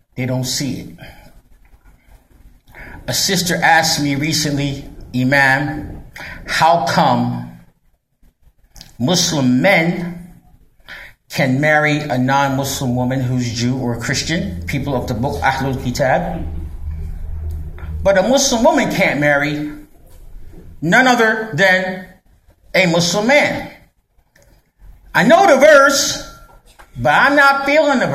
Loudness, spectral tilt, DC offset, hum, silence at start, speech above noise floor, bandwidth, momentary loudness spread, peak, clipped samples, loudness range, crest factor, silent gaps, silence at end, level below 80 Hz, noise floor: -15 LUFS; -4 dB/octave; under 0.1%; none; 0.15 s; 44 dB; 15 kHz; 18 LU; 0 dBFS; under 0.1%; 6 LU; 16 dB; none; 0 s; -36 dBFS; -59 dBFS